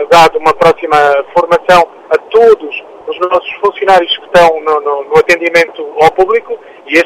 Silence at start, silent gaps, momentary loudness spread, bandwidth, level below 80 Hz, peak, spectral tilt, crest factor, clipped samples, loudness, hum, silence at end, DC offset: 0 s; none; 8 LU; 16 kHz; -42 dBFS; 0 dBFS; -4 dB/octave; 10 dB; 2%; -9 LUFS; none; 0 s; under 0.1%